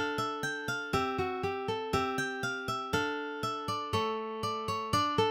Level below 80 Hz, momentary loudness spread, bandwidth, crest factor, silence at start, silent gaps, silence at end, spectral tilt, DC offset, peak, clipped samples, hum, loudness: -58 dBFS; 4 LU; 16.5 kHz; 18 dB; 0 s; none; 0 s; -4.5 dB/octave; under 0.1%; -14 dBFS; under 0.1%; none; -33 LUFS